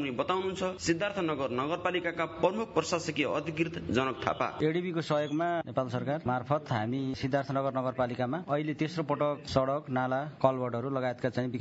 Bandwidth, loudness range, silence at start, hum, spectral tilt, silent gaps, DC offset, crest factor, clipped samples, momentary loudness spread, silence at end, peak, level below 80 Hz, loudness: 8 kHz; 1 LU; 0 s; none; -6 dB/octave; none; under 0.1%; 22 dB; under 0.1%; 3 LU; 0 s; -10 dBFS; -64 dBFS; -31 LUFS